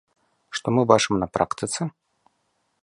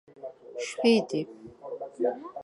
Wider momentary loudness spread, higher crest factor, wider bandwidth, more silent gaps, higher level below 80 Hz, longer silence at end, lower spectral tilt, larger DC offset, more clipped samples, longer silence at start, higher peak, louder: second, 13 LU vs 21 LU; about the same, 24 dB vs 20 dB; about the same, 11.5 kHz vs 11.5 kHz; neither; first, -54 dBFS vs -74 dBFS; first, 0.95 s vs 0 s; about the same, -4.5 dB/octave vs -5 dB/octave; neither; neither; first, 0.5 s vs 0.15 s; first, -2 dBFS vs -10 dBFS; first, -23 LUFS vs -28 LUFS